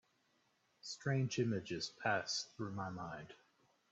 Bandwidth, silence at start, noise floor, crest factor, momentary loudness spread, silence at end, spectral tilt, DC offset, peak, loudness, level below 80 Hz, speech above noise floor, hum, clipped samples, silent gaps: 8.2 kHz; 0.85 s; -78 dBFS; 20 dB; 13 LU; 0.55 s; -4.5 dB/octave; under 0.1%; -22 dBFS; -41 LUFS; -78 dBFS; 37 dB; none; under 0.1%; none